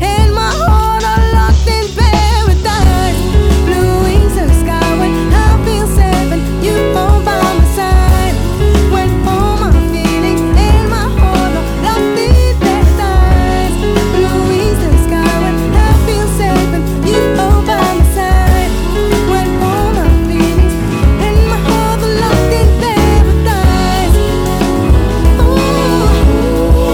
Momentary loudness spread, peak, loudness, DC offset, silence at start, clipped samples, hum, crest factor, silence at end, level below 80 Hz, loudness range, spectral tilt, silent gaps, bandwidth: 3 LU; 0 dBFS; -11 LUFS; under 0.1%; 0 s; 0.1%; none; 10 dB; 0 s; -12 dBFS; 1 LU; -6 dB/octave; none; 17 kHz